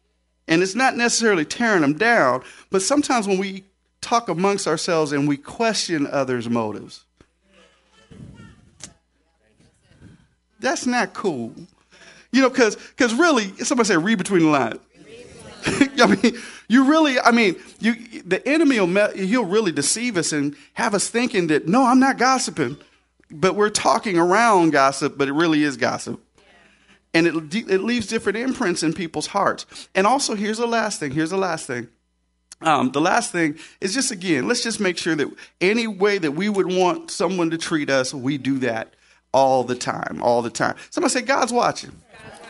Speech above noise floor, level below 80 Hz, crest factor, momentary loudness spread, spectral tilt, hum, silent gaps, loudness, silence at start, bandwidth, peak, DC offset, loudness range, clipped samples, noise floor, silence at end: 49 dB; -60 dBFS; 20 dB; 9 LU; -4 dB/octave; none; none; -20 LUFS; 0.5 s; 11.5 kHz; 0 dBFS; under 0.1%; 5 LU; under 0.1%; -69 dBFS; 0 s